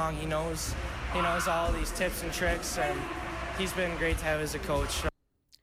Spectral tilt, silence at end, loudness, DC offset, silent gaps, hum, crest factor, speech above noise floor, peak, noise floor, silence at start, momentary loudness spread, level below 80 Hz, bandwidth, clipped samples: -4 dB/octave; 0.5 s; -31 LUFS; under 0.1%; none; none; 14 dB; 34 dB; -18 dBFS; -65 dBFS; 0 s; 6 LU; -40 dBFS; 16 kHz; under 0.1%